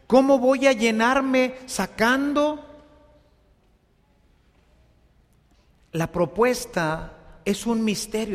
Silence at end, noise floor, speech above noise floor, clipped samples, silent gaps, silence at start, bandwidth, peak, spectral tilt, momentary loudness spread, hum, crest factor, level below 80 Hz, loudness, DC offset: 0 s; -61 dBFS; 40 dB; under 0.1%; none; 0.1 s; 15.5 kHz; -4 dBFS; -4.5 dB/octave; 11 LU; none; 20 dB; -52 dBFS; -22 LUFS; under 0.1%